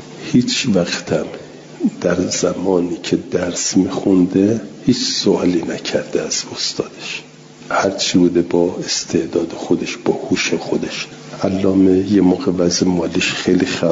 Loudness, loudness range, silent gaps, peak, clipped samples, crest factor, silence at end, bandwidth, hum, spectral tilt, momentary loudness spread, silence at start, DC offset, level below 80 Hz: -17 LUFS; 3 LU; none; -2 dBFS; under 0.1%; 14 dB; 0 s; 7.8 kHz; none; -4.5 dB/octave; 8 LU; 0 s; under 0.1%; -54 dBFS